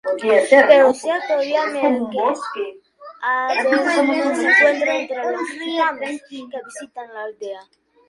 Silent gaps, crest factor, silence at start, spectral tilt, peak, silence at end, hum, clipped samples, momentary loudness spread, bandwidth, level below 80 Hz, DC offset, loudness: none; 18 dB; 0.05 s; -3 dB/octave; 0 dBFS; 0.45 s; none; under 0.1%; 20 LU; 11.5 kHz; -70 dBFS; under 0.1%; -17 LUFS